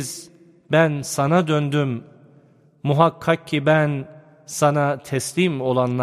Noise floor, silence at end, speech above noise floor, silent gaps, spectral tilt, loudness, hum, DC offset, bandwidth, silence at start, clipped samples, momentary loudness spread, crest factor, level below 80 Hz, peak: -53 dBFS; 0 s; 34 dB; none; -5.5 dB/octave; -20 LUFS; none; under 0.1%; 15 kHz; 0 s; under 0.1%; 12 LU; 20 dB; -62 dBFS; 0 dBFS